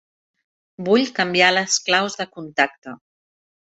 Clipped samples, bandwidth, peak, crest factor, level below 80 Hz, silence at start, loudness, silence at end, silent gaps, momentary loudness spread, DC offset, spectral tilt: under 0.1%; 8.2 kHz; -2 dBFS; 20 dB; -68 dBFS; 0.8 s; -18 LUFS; 0.65 s; 2.78-2.82 s; 15 LU; under 0.1%; -2.5 dB/octave